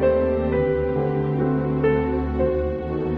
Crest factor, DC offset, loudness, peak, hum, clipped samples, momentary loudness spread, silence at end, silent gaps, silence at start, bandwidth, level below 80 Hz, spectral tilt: 12 dB; under 0.1%; -22 LUFS; -8 dBFS; none; under 0.1%; 3 LU; 0 s; none; 0 s; 5 kHz; -34 dBFS; -11 dB/octave